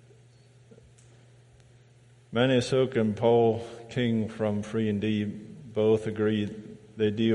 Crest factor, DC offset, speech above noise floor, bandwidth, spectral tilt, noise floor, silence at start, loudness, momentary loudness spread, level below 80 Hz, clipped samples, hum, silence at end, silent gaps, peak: 18 dB; under 0.1%; 31 dB; 11 kHz; -7 dB/octave; -57 dBFS; 2.3 s; -27 LUFS; 12 LU; -62 dBFS; under 0.1%; none; 0 s; none; -10 dBFS